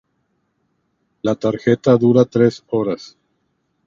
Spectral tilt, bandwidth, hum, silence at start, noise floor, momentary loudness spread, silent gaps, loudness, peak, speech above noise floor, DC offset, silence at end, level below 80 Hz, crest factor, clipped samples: -8 dB/octave; 7.4 kHz; none; 1.25 s; -68 dBFS; 11 LU; none; -17 LUFS; 0 dBFS; 52 dB; under 0.1%; 0.8 s; -56 dBFS; 18 dB; under 0.1%